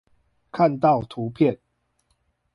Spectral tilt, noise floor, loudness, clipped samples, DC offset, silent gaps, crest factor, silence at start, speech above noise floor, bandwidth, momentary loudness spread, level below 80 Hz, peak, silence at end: -9.5 dB/octave; -70 dBFS; -22 LUFS; under 0.1%; under 0.1%; none; 18 dB; 0.55 s; 49 dB; 11 kHz; 16 LU; -58 dBFS; -6 dBFS; 1 s